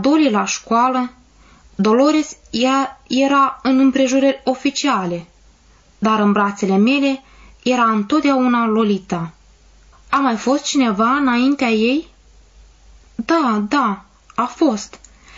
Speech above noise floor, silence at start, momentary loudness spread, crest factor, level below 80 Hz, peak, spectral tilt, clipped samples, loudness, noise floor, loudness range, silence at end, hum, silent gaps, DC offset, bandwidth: 35 dB; 0 s; 11 LU; 12 dB; -52 dBFS; -4 dBFS; -4.5 dB/octave; under 0.1%; -17 LUFS; -51 dBFS; 2 LU; 0.4 s; none; none; under 0.1%; 7.8 kHz